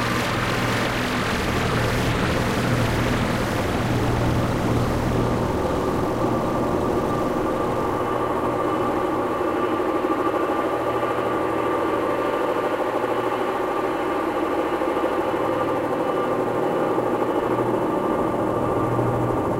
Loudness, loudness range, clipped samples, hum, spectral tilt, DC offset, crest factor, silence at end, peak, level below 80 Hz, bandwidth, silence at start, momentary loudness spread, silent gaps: -23 LUFS; 1 LU; under 0.1%; none; -6 dB/octave; under 0.1%; 14 dB; 0 s; -8 dBFS; -38 dBFS; 16 kHz; 0 s; 2 LU; none